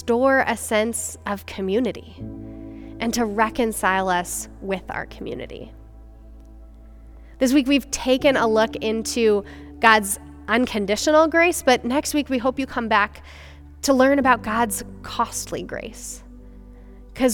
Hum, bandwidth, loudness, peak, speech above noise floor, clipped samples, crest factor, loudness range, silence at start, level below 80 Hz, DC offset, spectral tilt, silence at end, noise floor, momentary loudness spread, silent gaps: none; 18.5 kHz; -21 LUFS; 0 dBFS; 22 dB; under 0.1%; 22 dB; 7 LU; 0 s; -44 dBFS; under 0.1%; -3.5 dB/octave; 0 s; -43 dBFS; 18 LU; none